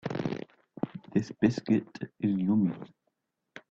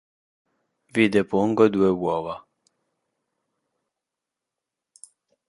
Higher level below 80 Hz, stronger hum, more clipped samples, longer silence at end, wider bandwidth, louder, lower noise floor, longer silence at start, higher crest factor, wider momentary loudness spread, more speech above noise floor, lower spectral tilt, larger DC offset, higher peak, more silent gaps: second, -66 dBFS vs -60 dBFS; neither; neither; second, 0.1 s vs 3.1 s; second, 7.6 kHz vs 11.5 kHz; second, -30 LUFS vs -21 LUFS; second, -80 dBFS vs -86 dBFS; second, 0.05 s vs 0.95 s; about the same, 20 dB vs 22 dB; first, 16 LU vs 12 LU; second, 52 dB vs 65 dB; first, -8 dB/octave vs -6.5 dB/octave; neither; second, -10 dBFS vs -4 dBFS; neither